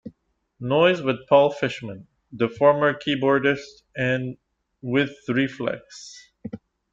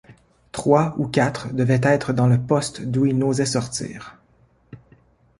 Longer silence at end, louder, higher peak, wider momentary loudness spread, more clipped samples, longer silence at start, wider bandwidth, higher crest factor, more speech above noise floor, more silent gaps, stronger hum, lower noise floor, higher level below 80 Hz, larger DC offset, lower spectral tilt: second, 0.35 s vs 0.6 s; about the same, -22 LUFS vs -20 LUFS; about the same, -4 dBFS vs -2 dBFS; first, 20 LU vs 10 LU; neither; about the same, 0.05 s vs 0.1 s; second, 7.8 kHz vs 11.5 kHz; about the same, 20 dB vs 20 dB; first, 42 dB vs 38 dB; neither; neither; first, -65 dBFS vs -58 dBFS; second, -62 dBFS vs -52 dBFS; neither; about the same, -6 dB/octave vs -6 dB/octave